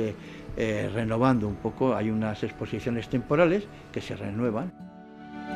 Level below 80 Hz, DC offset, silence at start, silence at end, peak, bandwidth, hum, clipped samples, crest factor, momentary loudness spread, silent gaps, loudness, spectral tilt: -50 dBFS; under 0.1%; 0 s; 0 s; -8 dBFS; 11.5 kHz; none; under 0.1%; 20 dB; 17 LU; none; -28 LUFS; -7.5 dB/octave